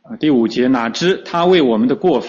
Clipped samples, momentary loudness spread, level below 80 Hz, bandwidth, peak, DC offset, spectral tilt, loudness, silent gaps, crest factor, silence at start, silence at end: under 0.1%; 4 LU; -54 dBFS; 7.4 kHz; -2 dBFS; under 0.1%; -6 dB/octave; -15 LUFS; none; 12 dB; 0.1 s; 0 s